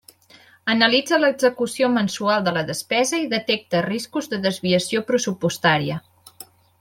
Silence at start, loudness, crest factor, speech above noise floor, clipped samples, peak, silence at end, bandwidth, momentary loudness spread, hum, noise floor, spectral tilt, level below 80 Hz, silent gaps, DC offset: 0.65 s; -21 LUFS; 20 dB; 31 dB; under 0.1%; -2 dBFS; 0.35 s; 16.5 kHz; 8 LU; none; -52 dBFS; -4 dB/octave; -62 dBFS; none; under 0.1%